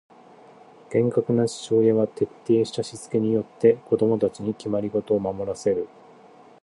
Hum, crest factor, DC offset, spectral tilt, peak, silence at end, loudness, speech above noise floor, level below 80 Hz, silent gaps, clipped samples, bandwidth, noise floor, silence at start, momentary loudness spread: none; 18 dB; under 0.1%; -7 dB/octave; -4 dBFS; 0.75 s; -23 LUFS; 27 dB; -60 dBFS; none; under 0.1%; 11.5 kHz; -50 dBFS; 0.9 s; 8 LU